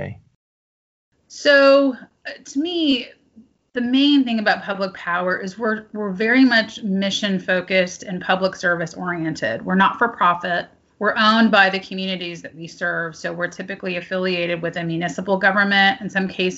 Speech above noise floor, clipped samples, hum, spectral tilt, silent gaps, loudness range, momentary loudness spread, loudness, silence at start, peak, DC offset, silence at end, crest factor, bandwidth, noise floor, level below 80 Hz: 32 dB; under 0.1%; none; -2.5 dB/octave; 0.35-1.12 s; 3 LU; 13 LU; -19 LUFS; 0 s; 0 dBFS; under 0.1%; 0 s; 20 dB; 8 kHz; -52 dBFS; -62 dBFS